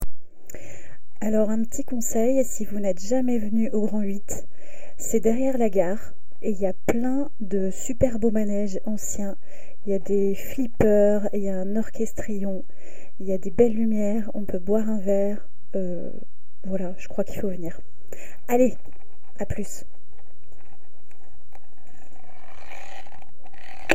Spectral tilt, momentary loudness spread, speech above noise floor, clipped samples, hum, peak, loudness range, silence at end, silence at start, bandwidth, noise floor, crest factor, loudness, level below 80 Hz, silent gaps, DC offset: -6 dB/octave; 20 LU; 32 dB; under 0.1%; none; 0 dBFS; 5 LU; 0 s; 0 s; 16 kHz; -57 dBFS; 24 dB; -26 LUFS; -46 dBFS; none; 10%